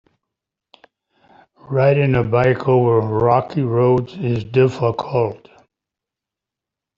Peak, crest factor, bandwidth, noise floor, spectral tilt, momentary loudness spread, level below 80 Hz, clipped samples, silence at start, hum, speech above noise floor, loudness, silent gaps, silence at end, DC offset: -2 dBFS; 16 dB; 7.2 kHz; -86 dBFS; -9 dB/octave; 7 LU; -50 dBFS; under 0.1%; 1.7 s; none; 69 dB; -17 LUFS; none; 1.6 s; under 0.1%